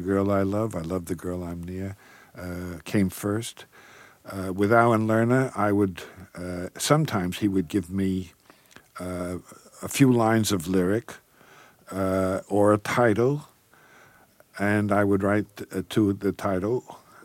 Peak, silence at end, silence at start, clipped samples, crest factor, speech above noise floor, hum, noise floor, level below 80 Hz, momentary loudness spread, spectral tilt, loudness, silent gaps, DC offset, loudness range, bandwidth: -4 dBFS; 0.3 s; 0 s; under 0.1%; 20 dB; 32 dB; none; -56 dBFS; -58 dBFS; 16 LU; -6 dB/octave; -25 LUFS; none; under 0.1%; 5 LU; 17 kHz